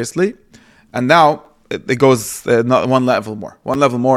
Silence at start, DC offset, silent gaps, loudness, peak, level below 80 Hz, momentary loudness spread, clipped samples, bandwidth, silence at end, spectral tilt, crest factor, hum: 0 s; under 0.1%; none; -15 LUFS; 0 dBFS; -54 dBFS; 16 LU; under 0.1%; 15.5 kHz; 0 s; -5.5 dB/octave; 16 dB; none